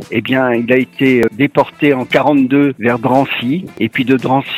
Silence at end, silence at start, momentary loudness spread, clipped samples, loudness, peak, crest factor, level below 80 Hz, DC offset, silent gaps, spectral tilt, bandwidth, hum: 0 s; 0 s; 5 LU; under 0.1%; -13 LUFS; 0 dBFS; 14 dB; -54 dBFS; under 0.1%; none; -7 dB/octave; 14.5 kHz; none